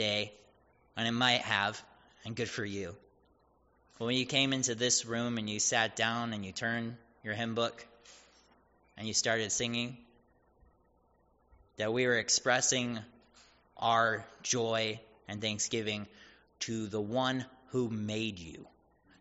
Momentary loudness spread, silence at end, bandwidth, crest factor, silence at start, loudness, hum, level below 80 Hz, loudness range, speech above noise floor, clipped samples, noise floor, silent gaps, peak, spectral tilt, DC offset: 15 LU; 0.55 s; 8 kHz; 24 dB; 0 s; -32 LUFS; none; -70 dBFS; 5 LU; 36 dB; under 0.1%; -69 dBFS; none; -12 dBFS; -2.5 dB/octave; under 0.1%